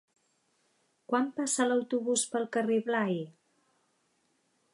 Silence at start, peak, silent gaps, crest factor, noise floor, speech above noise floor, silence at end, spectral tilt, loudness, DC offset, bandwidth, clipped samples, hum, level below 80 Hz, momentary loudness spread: 1.1 s; -14 dBFS; none; 18 dB; -74 dBFS; 44 dB; 1.45 s; -3.5 dB/octave; -30 LUFS; under 0.1%; 11.5 kHz; under 0.1%; none; -88 dBFS; 5 LU